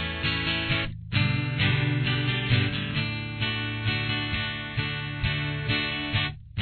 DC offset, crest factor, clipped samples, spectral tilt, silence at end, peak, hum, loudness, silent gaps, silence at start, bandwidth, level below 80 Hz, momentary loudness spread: under 0.1%; 16 dB; under 0.1%; -8 dB/octave; 0 s; -10 dBFS; none; -27 LUFS; none; 0 s; 4.6 kHz; -44 dBFS; 5 LU